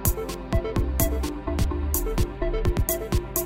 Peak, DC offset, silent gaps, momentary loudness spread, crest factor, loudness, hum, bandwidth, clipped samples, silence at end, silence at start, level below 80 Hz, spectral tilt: -4 dBFS; 0.3%; none; 3 LU; 20 dB; -27 LUFS; none; 16.5 kHz; under 0.1%; 0 s; 0 s; -28 dBFS; -5.5 dB/octave